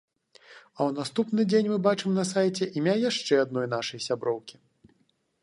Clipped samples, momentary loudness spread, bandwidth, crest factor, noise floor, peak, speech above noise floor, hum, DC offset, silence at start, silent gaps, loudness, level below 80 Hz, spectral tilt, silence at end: under 0.1%; 7 LU; 11.5 kHz; 18 dB; -70 dBFS; -8 dBFS; 44 dB; none; under 0.1%; 0.5 s; none; -27 LUFS; -74 dBFS; -5 dB/octave; 0.9 s